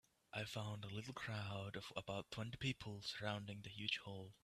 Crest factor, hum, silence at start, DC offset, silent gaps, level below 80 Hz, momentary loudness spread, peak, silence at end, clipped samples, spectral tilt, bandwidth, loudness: 22 dB; none; 0.35 s; under 0.1%; none; -72 dBFS; 6 LU; -28 dBFS; 0.1 s; under 0.1%; -4.5 dB/octave; 14.5 kHz; -47 LUFS